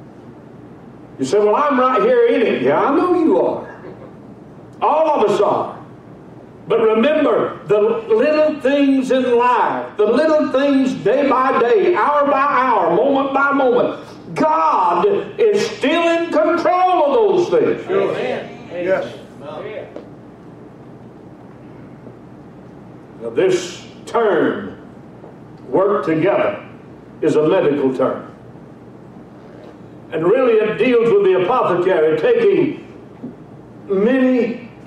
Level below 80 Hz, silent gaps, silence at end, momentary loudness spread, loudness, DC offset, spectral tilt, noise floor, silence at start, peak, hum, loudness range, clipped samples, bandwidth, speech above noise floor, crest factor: -58 dBFS; none; 0.05 s; 16 LU; -16 LUFS; under 0.1%; -6 dB/octave; -38 dBFS; 0 s; -6 dBFS; none; 8 LU; under 0.1%; 10.5 kHz; 24 dB; 12 dB